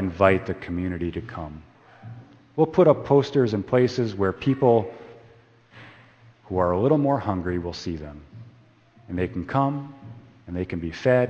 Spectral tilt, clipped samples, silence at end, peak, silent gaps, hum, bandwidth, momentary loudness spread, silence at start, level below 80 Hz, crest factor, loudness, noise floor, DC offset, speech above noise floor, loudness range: -8 dB/octave; under 0.1%; 0 s; -2 dBFS; none; none; 8.2 kHz; 21 LU; 0 s; -50 dBFS; 22 dB; -23 LUFS; -54 dBFS; under 0.1%; 32 dB; 8 LU